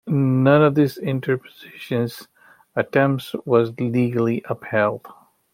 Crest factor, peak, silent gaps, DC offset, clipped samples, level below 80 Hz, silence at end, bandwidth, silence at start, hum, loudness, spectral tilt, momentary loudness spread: 18 dB; -2 dBFS; none; under 0.1%; under 0.1%; -64 dBFS; 0.4 s; 16.5 kHz; 0.05 s; none; -20 LUFS; -8 dB/octave; 13 LU